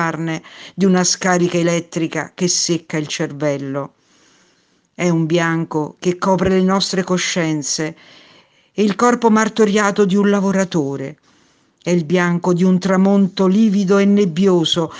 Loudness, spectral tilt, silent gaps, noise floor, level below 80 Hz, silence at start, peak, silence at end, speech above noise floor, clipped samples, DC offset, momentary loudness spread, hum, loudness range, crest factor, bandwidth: -16 LUFS; -5 dB/octave; none; -59 dBFS; -54 dBFS; 0 s; 0 dBFS; 0 s; 43 dB; under 0.1%; under 0.1%; 9 LU; none; 5 LU; 16 dB; 10 kHz